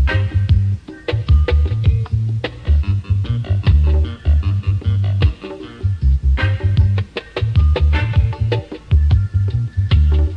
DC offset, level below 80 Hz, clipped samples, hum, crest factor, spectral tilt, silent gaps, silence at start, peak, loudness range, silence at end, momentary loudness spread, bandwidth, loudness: under 0.1%; -18 dBFS; under 0.1%; none; 12 dB; -8 dB/octave; none; 0 s; -2 dBFS; 1 LU; 0 s; 8 LU; 5.4 kHz; -17 LUFS